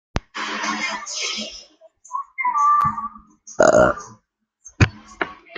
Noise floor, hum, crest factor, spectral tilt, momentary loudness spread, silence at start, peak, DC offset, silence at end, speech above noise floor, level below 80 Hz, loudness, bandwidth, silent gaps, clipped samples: -64 dBFS; none; 20 dB; -4.5 dB/octave; 16 LU; 0.15 s; -2 dBFS; under 0.1%; 0 s; 43 dB; -42 dBFS; -20 LUFS; 9.6 kHz; none; under 0.1%